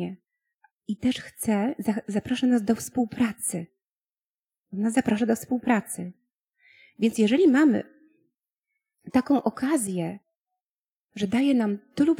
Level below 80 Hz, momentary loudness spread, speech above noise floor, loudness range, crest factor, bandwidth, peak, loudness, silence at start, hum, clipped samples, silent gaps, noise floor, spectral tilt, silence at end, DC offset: -64 dBFS; 15 LU; over 66 dB; 4 LU; 18 dB; 16.5 kHz; -8 dBFS; -25 LUFS; 0 s; none; under 0.1%; 0.71-0.78 s, 3.91-4.09 s, 4.22-4.45 s, 4.58-4.64 s, 8.58-8.63 s, 10.35-10.44 s, 10.62-10.83 s, 10.91-11.09 s; under -90 dBFS; -5 dB/octave; 0.05 s; under 0.1%